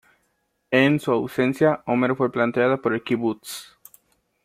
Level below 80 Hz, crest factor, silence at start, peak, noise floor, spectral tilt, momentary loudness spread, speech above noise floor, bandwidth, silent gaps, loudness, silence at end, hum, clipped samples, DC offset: -64 dBFS; 20 dB; 0.7 s; -4 dBFS; -71 dBFS; -6 dB/octave; 8 LU; 50 dB; 16 kHz; none; -22 LUFS; 0.8 s; none; under 0.1%; under 0.1%